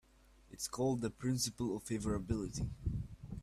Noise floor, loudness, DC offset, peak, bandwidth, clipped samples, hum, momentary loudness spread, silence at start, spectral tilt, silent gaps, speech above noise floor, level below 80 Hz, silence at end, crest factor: -65 dBFS; -39 LUFS; under 0.1%; -22 dBFS; 15.5 kHz; under 0.1%; none; 8 LU; 0.5 s; -5 dB/octave; none; 27 dB; -52 dBFS; 0 s; 18 dB